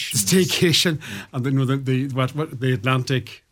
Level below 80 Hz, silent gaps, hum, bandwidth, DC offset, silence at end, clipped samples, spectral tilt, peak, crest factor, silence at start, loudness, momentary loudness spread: -56 dBFS; none; none; 18 kHz; under 0.1%; 0.15 s; under 0.1%; -4.5 dB/octave; -6 dBFS; 16 dB; 0 s; -21 LUFS; 9 LU